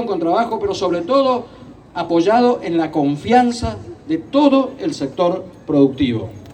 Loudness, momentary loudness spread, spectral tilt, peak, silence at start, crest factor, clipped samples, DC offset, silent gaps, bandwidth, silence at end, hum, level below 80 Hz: -17 LUFS; 12 LU; -6.5 dB/octave; 0 dBFS; 0 s; 16 dB; under 0.1%; under 0.1%; none; 9.6 kHz; 0 s; none; -46 dBFS